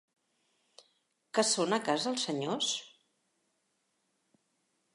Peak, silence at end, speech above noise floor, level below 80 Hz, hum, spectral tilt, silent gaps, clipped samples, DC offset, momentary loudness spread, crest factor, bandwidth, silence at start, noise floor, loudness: -14 dBFS; 2.05 s; 47 dB; -90 dBFS; none; -2.5 dB/octave; none; under 0.1%; under 0.1%; 6 LU; 22 dB; 11.5 kHz; 1.35 s; -79 dBFS; -31 LUFS